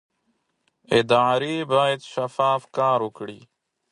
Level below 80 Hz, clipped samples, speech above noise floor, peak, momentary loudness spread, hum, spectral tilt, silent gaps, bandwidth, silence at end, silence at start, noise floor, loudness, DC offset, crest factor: -66 dBFS; under 0.1%; 50 dB; -6 dBFS; 11 LU; none; -5 dB/octave; none; 11.5 kHz; 0.55 s; 0.9 s; -72 dBFS; -22 LUFS; under 0.1%; 18 dB